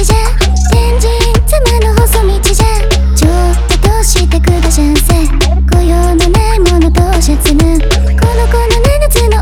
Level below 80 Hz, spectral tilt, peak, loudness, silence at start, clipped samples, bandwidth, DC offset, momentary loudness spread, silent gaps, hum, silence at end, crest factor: -10 dBFS; -5 dB/octave; 0 dBFS; -10 LUFS; 0 s; under 0.1%; 17 kHz; under 0.1%; 2 LU; none; none; 0 s; 8 dB